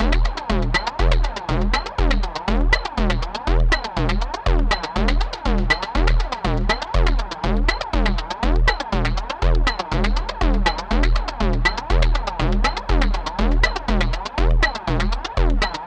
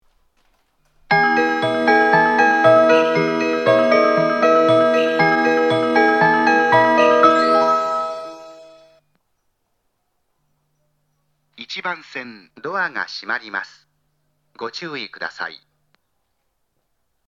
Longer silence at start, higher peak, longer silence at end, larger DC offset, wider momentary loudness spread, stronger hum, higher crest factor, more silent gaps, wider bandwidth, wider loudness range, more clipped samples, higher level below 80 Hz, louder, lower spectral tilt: second, 0 s vs 1.1 s; about the same, -2 dBFS vs 0 dBFS; second, 0 s vs 1.7 s; neither; second, 4 LU vs 17 LU; neither; about the same, 16 dB vs 18 dB; neither; about the same, 8.4 kHz vs 8.6 kHz; second, 1 LU vs 18 LU; neither; first, -20 dBFS vs -66 dBFS; second, -22 LUFS vs -16 LUFS; about the same, -5.5 dB/octave vs -5.5 dB/octave